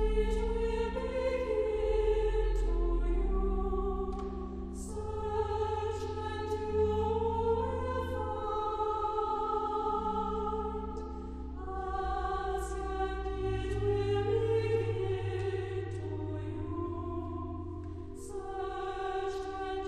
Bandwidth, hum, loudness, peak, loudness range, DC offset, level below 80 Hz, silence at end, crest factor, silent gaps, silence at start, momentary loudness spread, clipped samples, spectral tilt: 10.5 kHz; none; -34 LUFS; -18 dBFS; 5 LU; under 0.1%; -38 dBFS; 0 s; 14 dB; none; 0 s; 10 LU; under 0.1%; -7 dB/octave